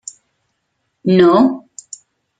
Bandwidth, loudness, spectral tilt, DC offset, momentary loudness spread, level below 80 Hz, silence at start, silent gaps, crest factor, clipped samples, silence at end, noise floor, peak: 9.4 kHz; -13 LUFS; -6.5 dB/octave; under 0.1%; 25 LU; -58 dBFS; 1.05 s; none; 16 dB; under 0.1%; 0.8 s; -70 dBFS; 0 dBFS